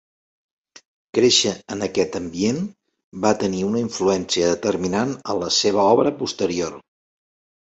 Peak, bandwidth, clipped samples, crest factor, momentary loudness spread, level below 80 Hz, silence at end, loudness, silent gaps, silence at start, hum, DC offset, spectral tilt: -2 dBFS; 8.2 kHz; under 0.1%; 20 dB; 10 LU; -54 dBFS; 0.95 s; -20 LUFS; 3.04-3.11 s; 1.15 s; none; under 0.1%; -4 dB/octave